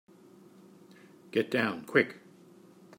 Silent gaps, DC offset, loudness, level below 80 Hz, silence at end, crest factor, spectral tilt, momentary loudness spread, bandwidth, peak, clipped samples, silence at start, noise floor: none; under 0.1%; -30 LUFS; -78 dBFS; 0.8 s; 24 dB; -6 dB/octave; 7 LU; 16 kHz; -10 dBFS; under 0.1%; 1.35 s; -56 dBFS